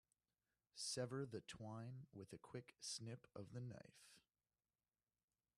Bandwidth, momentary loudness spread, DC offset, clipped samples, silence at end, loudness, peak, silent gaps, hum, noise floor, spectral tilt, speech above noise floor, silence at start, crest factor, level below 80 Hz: 13.5 kHz; 16 LU; under 0.1%; under 0.1%; 1.4 s; -53 LUFS; -34 dBFS; none; none; under -90 dBFS; -4 dB/octave; over 37 dB; 0.75 s; 20 dB; -86 dBFS